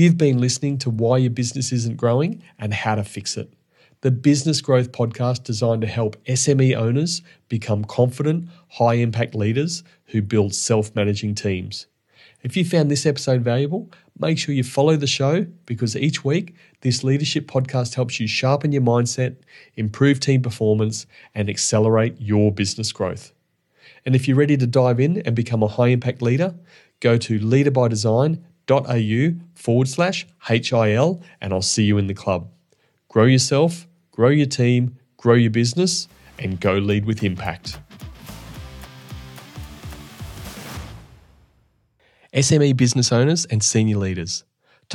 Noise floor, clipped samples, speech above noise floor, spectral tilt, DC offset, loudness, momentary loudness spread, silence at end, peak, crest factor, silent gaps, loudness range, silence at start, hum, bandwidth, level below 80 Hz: -63 dBFS; under 0.1%; 44 dB; -5.5 dB/octave; under 0.1%; -20 LUFS; 17 LU; 0 s; -4 dBFS; 16 dB; none; 4 LU; 0 s; none; 12 kHz; -52 dBFS